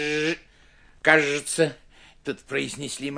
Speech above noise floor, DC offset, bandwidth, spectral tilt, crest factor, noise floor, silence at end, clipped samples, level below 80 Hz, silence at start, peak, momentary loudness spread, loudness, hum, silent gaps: 30 dB; under 0.1%; 10.5 kHz; -3.5 dB/octave; 24 dB; -54 dBFS; 0 s; under 0.1%; -58 dBFS; 0 s; -2 dBFS; 16 LU; -24 LUFS; none; none